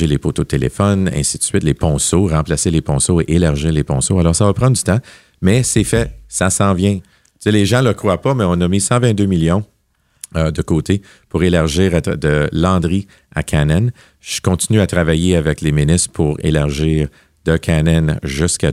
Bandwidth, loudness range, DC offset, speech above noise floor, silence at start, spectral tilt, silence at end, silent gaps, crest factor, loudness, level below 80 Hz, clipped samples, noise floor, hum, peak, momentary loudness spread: 14.5 kHz; 2 LU; under 0.1%; 46 dB; 0 s; -5.5 dB/octave; 0 s; none; 14 dB; -15 LUFS; -32 dBFS; under 0.1%; -60 dBFS; none; 0 dBFS; 6 LU